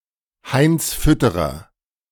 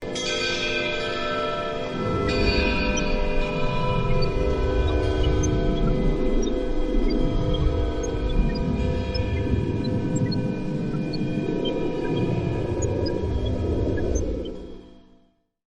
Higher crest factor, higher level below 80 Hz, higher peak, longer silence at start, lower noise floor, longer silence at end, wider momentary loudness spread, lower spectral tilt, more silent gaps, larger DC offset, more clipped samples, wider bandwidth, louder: about the same, 16 dB vs 16 dB; about the same, -32 dBFS vs -28 dBFS; first, -4 dBFS vs -8 dBFS; first, 0.45 s vs 0 s; second, -43 dBFS vs -61 dBFS; second, 0.5 s vs 0.75 s; first, 9 LU vs 4 LU; about the same, -5.5 dB/octave vs -6 dB/octave; neither; neither; neither; first, 18.5 kHz vs 9.8 kHz; first, -18 LUFS vs -25 LUFS